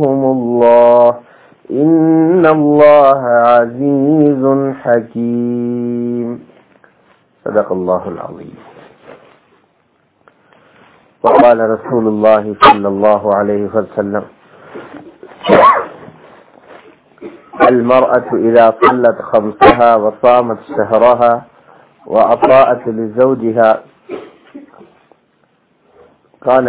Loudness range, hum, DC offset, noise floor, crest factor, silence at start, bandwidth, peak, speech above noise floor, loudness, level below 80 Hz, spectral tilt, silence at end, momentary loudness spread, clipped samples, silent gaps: 10 LU; none; under 0.1%; -57 dBFS; 12 dB; 0 s; 4 kHz; 0 dBFS; 46 dB; -11 LUFS; -48 dBFS; -10.5 dB/octave; 0 s; 14 LU; 1%; none